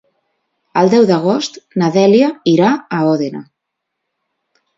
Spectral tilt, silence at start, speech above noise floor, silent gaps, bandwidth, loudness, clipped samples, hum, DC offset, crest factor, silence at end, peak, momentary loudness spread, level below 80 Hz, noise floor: -6.5 dB/octave; 0.75 s; 64 dB; none; 7.8 kHz; -13 LUFS; under 0.1%; none; under 0.1%; 14 dB; 1.35 s; 0 dBFS; 10 LU; -62 dBFS; -76 dBFS